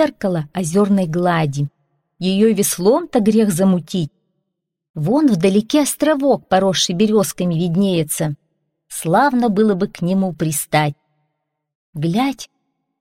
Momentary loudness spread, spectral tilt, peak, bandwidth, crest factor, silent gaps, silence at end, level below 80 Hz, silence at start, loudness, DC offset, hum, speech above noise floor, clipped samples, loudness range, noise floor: 10 LU; -5.5 dB/octave; -4 dBFS; 16.5 kHz; 14 dB; 4.90-4.94 s, 11.75-11.93 s; 0.55 s; -54 dBFS; 0 s; -17 LUFS; under 0.1%; none; 60 dB; under 0.1%; 2 LU; -77 dBFS